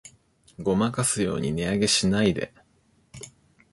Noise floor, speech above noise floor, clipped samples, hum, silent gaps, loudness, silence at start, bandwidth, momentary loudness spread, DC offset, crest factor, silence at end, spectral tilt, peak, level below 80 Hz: -64 dBFS; 40 dB; under 0.1%; none; none; -24 LUFS; 0.05 s; 12 kHz; 22 LU; under 0.1%; 18 dB; 0.45 s; -4 dB/octave; -10 dBFS; -50 dBFS